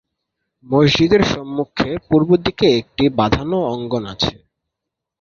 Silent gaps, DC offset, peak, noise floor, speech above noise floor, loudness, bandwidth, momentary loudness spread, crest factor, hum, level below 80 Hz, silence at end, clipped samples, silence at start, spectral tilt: none; under 0.1%; -2 dBFS; -82 dBFS; 65 dB; -17 LUFS; 7.4 kHz; 9 LU; 16 dB; none; -40 dBFS; 0.9 s; under 0.1%; 0.7 s; -6 dB/octave